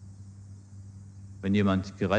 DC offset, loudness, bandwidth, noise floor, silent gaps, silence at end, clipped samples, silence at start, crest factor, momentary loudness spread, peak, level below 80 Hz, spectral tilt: under 0.1%; -28 LUFS; 9 kHz; -47 dBFS; none; 0 s; under 0.1%; 0 s; 20 dB; 22 LU; -12 dBFS; -60 dBFS; -7.5 dB/octave